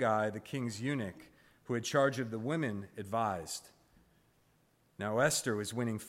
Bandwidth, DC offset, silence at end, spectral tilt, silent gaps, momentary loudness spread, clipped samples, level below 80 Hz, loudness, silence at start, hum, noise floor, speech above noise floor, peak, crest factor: 16 kHz; under 0.1%; 0 s; -4.5 dB/octave; none; 11 LU; under 0.1%; -70 dBFS; -35 LUFS; 0 s; none; -71 dBFS; 36 dB; -16 dBFS; 20 dB